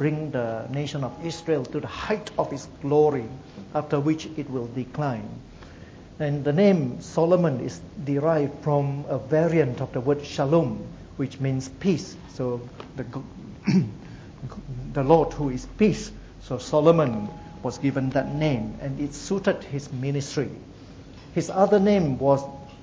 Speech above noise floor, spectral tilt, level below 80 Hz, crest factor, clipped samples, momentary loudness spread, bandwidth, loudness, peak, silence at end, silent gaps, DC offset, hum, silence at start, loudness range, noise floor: 20 dB; -7 dB/octave; -48 dBFS; 22 dB; under 0.1%; 18 LU; 8 kHz; -25 LUFS; -4 dBFS; 0 s; none; under 0.1%; none; 0 s; 5 LU; -44 dBFS